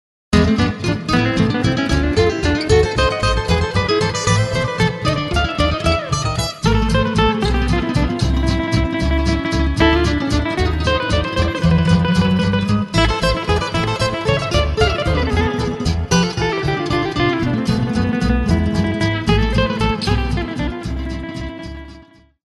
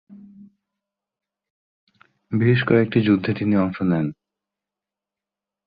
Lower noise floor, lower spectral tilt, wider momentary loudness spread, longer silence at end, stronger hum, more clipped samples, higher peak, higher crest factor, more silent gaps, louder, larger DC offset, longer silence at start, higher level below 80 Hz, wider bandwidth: second, -44 dBFS vs -88 dBFS; second, -5.5 dB/octave vs -10.5 dB/octave; about the same, 5 LU vs 7 LU; second, 0.45 s vs 1.55 s; second, none vs 50 Hz at -45 dBFS; neither; first, 0 dBFS vs -4 dBFS; about the same, 16 dB vs 20 dB; second, none vs 1.50-1.87 s; first, -17 LUFS vs -20 LUFS; neither; first, 0.3 s vs 0.1 s; first, -24 dBFS vs -56 dBFS; first, 11.5 kHz vs 5 kHz